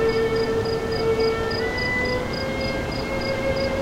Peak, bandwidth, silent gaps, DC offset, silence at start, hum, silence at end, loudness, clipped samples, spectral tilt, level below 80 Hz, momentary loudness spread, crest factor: -10 dBFS; 16 kHz; none; under 0.1%; 0 s; none; 0 s; -23 LUFS; under 0.1%; -5.5 dB/octave; -38 dBFS; 4 LU; 12 dB